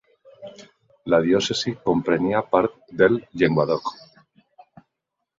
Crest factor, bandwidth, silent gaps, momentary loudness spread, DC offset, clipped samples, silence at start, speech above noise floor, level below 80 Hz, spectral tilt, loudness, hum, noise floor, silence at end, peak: 22 dB; 7.8 kHz; none; 21 LU; under 0.1%; under 0.1%; 0.4 s; 61 dB; -56 dBFS; -5.5 dB/octave; -21 LUFS; none; -81 dBFS; 1.45 s; -2 dBFS